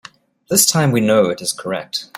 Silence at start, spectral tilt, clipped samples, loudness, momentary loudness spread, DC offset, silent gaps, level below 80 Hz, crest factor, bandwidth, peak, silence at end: 0.5 s; -3.5 dB/octave; under 0.1%; -16 LUFS; 10 LU; under 0.1%; none; -58 dBFS; 18 dB; 16.5 kHz; 0 dBFS; 0 s